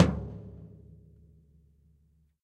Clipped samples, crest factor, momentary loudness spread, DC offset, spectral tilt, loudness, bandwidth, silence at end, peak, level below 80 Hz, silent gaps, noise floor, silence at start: under 0.1%; 28 dB; 24 LU; under 0.1%; -7.5 dB/octave; -33 LUFS; 10 kHz; 1.75 s; -4 dBFS; -46 dBFS; none; -66 dBFS; 0 s